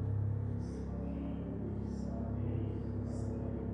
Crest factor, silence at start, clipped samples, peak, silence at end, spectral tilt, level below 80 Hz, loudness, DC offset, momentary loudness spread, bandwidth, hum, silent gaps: 12 dB; 0 s; under 0.1%; -26 dBFS; 0 s; -10 dB/octave; -46 dBFS; -39 LUFS; under 0.1%; 4 LU; 9 kHz; none; none